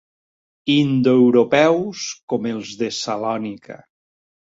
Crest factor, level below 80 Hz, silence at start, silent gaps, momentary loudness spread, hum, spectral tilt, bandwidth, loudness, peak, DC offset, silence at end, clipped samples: 18 dB; -62 dBFS; 0.65 s; 2.23-2.28 s; 14 LU; none; -5.5 dB/octave; 7.8 kHz; -18 LUFS; -2 dBFS; under 0.1%; 0.85 s; under 0.1%